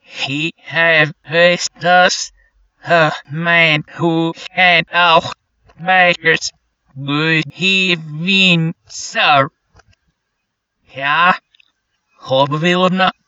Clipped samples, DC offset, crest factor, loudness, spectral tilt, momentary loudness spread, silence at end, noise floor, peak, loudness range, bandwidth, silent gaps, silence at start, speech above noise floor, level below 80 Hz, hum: under 0.1%; under 0.1%; 16 dB; -13 LUFS; -4 dB/octave; 11 LU; 0.15 s; -73 dBFS; 0 dBFS; 4 LU; 8 kHz; none; 0.1 s; 58 dB; -60 dBFS; none